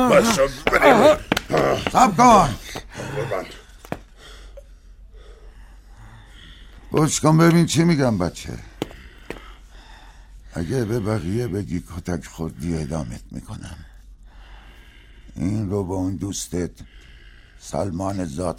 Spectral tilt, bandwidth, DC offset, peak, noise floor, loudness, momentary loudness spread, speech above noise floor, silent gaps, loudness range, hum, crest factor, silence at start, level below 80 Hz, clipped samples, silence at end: -5.5 dB/octave; 16 kHz; under 0.1%; -2 dBFS; -45 dBFS; -20 LUFS; 21 LU; 26 dB; none; 16 LU; none; 20 dB; 0 s; -42 dBFS; under 0.1%; 0 s